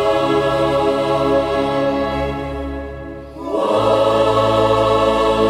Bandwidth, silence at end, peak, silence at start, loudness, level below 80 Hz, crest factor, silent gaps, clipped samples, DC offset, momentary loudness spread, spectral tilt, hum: 13.5 kHz; 0 s; -2 dBFS; 0 s; -17 LUFS; -36 dBFS; 14 dB; none; under 0.1%; under 0.1%; 12 LU; -6 dB/octave; none